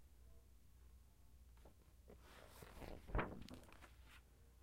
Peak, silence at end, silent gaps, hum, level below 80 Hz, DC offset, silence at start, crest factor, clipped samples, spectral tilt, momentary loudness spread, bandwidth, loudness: -28 dBFS; 0 s; none; none; -58 dBFS; under 0.1%; 0 s; 26 dB; under 0.1%; -6 dB/octave; 22 LU; 16 kHz; -54 LUFS